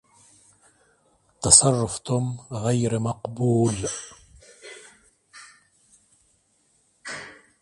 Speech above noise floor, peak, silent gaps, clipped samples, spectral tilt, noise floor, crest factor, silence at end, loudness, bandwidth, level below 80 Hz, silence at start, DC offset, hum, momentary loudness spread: 44 dB; 0 dBFS; none; under 0.1%; -4 dB/octave; -66 dBFS; 26 dB; 0.3 s; -21 LUFS; 11.5 kHz; -52 dBFS; 1.4 s; under 0.1%; none; 29 LU